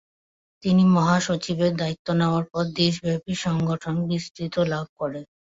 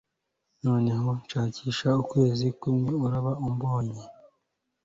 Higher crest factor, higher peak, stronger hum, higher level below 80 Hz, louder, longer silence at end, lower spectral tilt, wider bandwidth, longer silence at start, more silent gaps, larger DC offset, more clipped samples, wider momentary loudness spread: about the same, 16 dB vs 16 dB; first, -6 dBFS vs -12 dBFS; neither; about the same, -56 dBFS vs -58 dBFS; first, -23 LUFS vs -27 LUFS; second, 0.35 s vs 0.75 s; second, -6 dB/octave vs -7.5 dB/octave; about the same, 7.8 kHz vs 7.8 kHz; about the same, 0.65 s vs 0.65 s; first, 1.99-2.05 s, 4.31-4.35 s, 4.89-4.96 s vs none; neither; neither; first, 11 LU vs 6 LU